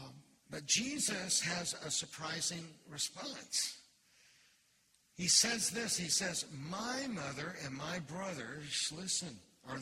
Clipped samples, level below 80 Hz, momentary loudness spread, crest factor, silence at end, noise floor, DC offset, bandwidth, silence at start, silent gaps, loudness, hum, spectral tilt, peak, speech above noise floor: under 0.1%; -74 dBFS; 15 LU; 24 dB; 0 s; -73 dBFS; under 0.1%; 16 kHz; 0 s; none; -36 LUFS; none; -1.5 dB/octave; -14 dBFS; 34 dB